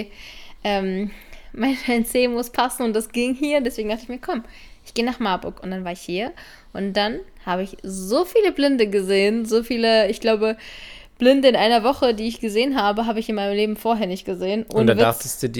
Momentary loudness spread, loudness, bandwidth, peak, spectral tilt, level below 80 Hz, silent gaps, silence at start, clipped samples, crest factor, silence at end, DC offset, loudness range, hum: 13 LU; -21 LUFS; 19 kHz; -2 dBFS; -4.5 dB/octave; -46 dBFS; none; 0 s; under 0.1%; 20 dB; 0 s; under 0.1%; 7 LU; none